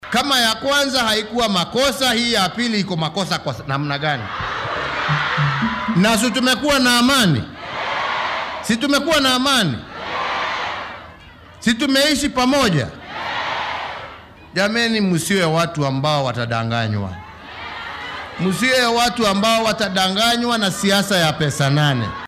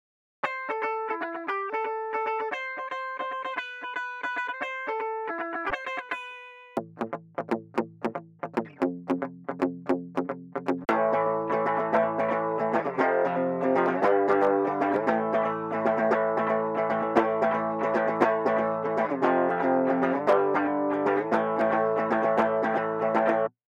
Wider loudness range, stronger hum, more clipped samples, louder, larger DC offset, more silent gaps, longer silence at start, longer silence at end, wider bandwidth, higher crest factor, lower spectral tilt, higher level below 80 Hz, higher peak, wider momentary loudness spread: second, 4 LU vs 8 LU; neither; neither; first, -18 LUFS vs -27 LUFS; neither; neither; second, 0 s vs 0.45 s; second, 0 s vs 0.2 s; first, 16 kHz vs 9.4 kHz; about the same, 16 dB vs 20 dB; second, -4 dB/octave vs -7 dB/octave; first, -46 dBFS vs -70 dBFS; first, -2 dBFS vs -6 dBFS; about the same, 12 LU vs 10 LU